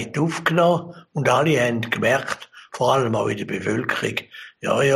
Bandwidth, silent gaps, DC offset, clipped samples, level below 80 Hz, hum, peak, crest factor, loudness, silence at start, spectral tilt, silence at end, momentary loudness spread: 15 kHz; none; under 0.1%; under 0.1%; -60 dBFS; none; -4 dBFS; 16 dB; -21 LUFS; 0 s; -5.5 dB/octave; 0 s; 12 LU